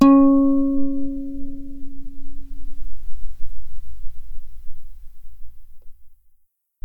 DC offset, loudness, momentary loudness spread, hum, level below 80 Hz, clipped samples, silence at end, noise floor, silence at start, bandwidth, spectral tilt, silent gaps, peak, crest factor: under 0.1%; -19 LUFS; 28 LU; none; -34 dBFS; under 0.1%; 0.7 s; -57 dBFS; 0 s; 5 kHz; -8 dB/octave; none; -2 dBFS; 16 dB